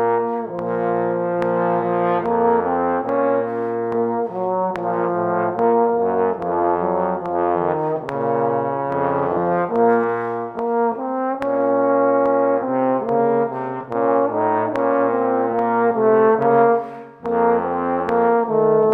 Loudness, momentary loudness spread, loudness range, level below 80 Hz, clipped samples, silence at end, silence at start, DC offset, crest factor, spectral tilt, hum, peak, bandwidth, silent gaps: -19 LUFS; 6 LU; 3 LU; -60 dBFS; under 0.1%; 0 s; 0 s; under 0.1%; 14 dB; -9.5 dB/octave; none; -4 dBFS; 4.2 kHz; none